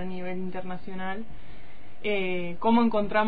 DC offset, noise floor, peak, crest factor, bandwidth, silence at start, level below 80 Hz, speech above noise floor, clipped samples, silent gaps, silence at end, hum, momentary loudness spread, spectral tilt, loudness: 4%; -49 dBFS; -10 dBFS; 18 dB; 4.9 kHz; 0 s; -54 dBFS; 22 dB; under 0.1%; none; 0 s; none; 16 LU; -9.5 dB/octave; -29 LUFS